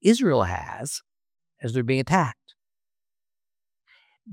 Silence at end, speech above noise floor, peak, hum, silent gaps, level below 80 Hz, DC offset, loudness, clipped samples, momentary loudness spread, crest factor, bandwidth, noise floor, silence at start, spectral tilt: 0 s; over 67 dB; -4 dBFS; none; none; -58 dBFS; under 0.1%; -25 LUFS; under 0.1%; 12 LU; 22 dB; 16.5 kHz; under -90 dBFS; 0.05 s; -5.5 dB/octave